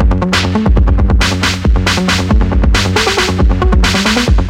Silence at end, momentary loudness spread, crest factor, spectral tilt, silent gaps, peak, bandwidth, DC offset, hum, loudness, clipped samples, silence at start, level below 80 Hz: 0 s; 2 LU; 10 dB; -5 dB/octave; none; 0 dBFS; 15 kHz; under 0.1%; none; -11 LUFS; under 0.1%; 0 s; -14 dBFS